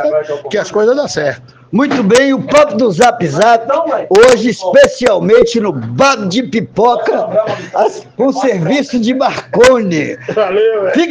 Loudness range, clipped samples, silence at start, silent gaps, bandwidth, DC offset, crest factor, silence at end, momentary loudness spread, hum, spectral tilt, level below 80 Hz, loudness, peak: 4 LU; 0.4%; 0 s; none; 10.5 kHz; under 0.1%; 10 dB; 0 s; 9 LU; none; -5 dB/octave; -46 dBFS; -11 LUFS; 0 dBFS